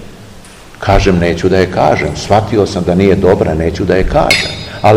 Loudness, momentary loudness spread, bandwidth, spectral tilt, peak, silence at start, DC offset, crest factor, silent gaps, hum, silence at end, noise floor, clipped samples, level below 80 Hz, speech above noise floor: -11 LUFS; 4 LU; 16.5 kHz; -6 dB/octave; 0 dBFS; 0 s; 0.7%; 12 dB; none; none; 0 s; -34 dBFS; 1%; -24 dBFS; 24 dB